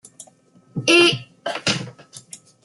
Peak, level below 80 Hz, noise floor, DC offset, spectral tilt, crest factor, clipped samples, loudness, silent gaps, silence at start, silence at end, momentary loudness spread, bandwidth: -2 dBFS; -64 dBFS; -54 dBFS; under 0.1%; -3 dB/octave; 20 dB; under 0.1%; -18 LUFS; none; 0.2 s; 0.3 s; 24 LU; 12 kHz